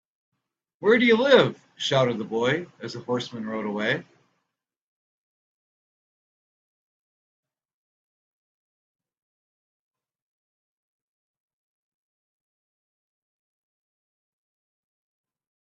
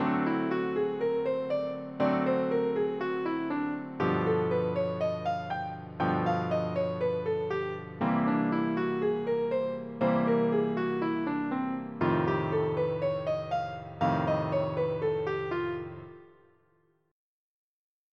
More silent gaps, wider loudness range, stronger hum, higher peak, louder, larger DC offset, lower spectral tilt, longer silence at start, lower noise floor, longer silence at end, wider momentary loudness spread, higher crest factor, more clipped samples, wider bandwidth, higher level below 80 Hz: neither; first, 12 LU vs 3 LU; neither; first, -2 dBFS vs -14 dBFS; first, -23 LUFS vs -30 LUFS; neither; second, -5 dB/octave vs -9 dB/octave; first, 0.8 s vs 0 s; first, -82 dBFS vs -70 dBFS; first, 11.65 s vs 1.85 s; first, 13 LU vs 6 LU; first, 28 dB vs 16 dB; neither; first, 7.8 kHz vs 6.8 kHz; about the same, -72 dBFS vs -68 dBFS